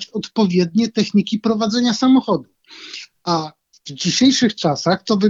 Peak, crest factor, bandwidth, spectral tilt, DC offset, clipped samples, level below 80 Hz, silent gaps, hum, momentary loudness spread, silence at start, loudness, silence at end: -2 dBFS; 14 dB; 7.8 kHz; -5 dB/octave; under 0.1%; under 0.1%; -58 dBFS; none; none; 19 LU; 0 s; -17 LUFS; 0 s